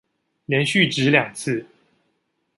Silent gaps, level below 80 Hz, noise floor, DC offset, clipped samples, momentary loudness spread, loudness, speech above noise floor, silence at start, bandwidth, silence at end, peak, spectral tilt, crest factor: none; -64 dBFS; -71 dBFS; under 0.1%; under 0.1%; 10 LU; -20 LUFS; 52 dB; 0.5 s; 11.5 kHz; 0.95 s; -2 dBFS; -4.5 dB/octave; 22 dB